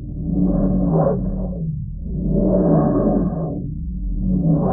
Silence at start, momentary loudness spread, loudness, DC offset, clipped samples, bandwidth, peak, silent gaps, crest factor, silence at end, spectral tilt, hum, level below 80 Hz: 0 s; 11 LU; -20 LUFS; under 0.1%; under 0.1%; 1.9 kHz; -4 dBFS; none; 14 dB; 0 s; -17 dB/octave; none; -28 dBFS